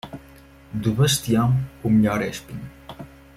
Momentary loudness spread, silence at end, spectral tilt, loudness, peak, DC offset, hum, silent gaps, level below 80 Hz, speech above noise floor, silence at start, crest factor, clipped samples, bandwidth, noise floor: 21 LU; 0.3 s; -5.5 dB/octave; -21 LUFS; -6 dBFS; under 0.1%; none; none; -46 dBFS; 27 dB; 0.05 s; 16 dB; under 0.1%; 16 kHz; -47 dBFS